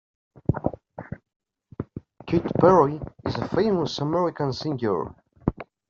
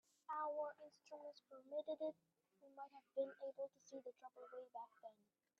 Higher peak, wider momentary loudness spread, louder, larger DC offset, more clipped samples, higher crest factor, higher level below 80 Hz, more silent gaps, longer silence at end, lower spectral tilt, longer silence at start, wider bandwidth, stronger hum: first, -4 dBFS vs -34 dBFS; first, 21 LU vs 17 LU; first, -24 LUFS vs -51 LUFS; neither; neither; about the same, 22 dB vs 18 dB; first, -48 dBFS vs under -90 dBFS; first, 1.36-1.40 s vs none; second, 0.25 s vs 0.45 s; first, -6.5 dB/octave vs -2 dB/octave; first, 0.5 s vs 0.3 s; about the same, 7.4 kHz vs 7.6 kHz; neither